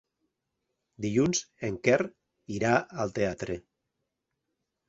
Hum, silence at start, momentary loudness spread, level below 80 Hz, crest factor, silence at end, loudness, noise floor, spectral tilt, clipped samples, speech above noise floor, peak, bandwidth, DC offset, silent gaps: none; 1 s; 11 LU; -60 dBFS; 24 dB; 1.3 s; -29 LUFS; -83 dBFS; -5 dB/octave; under 0.1%; 55 dB; -8 dBFS; 8 kHz; under 0.1%; none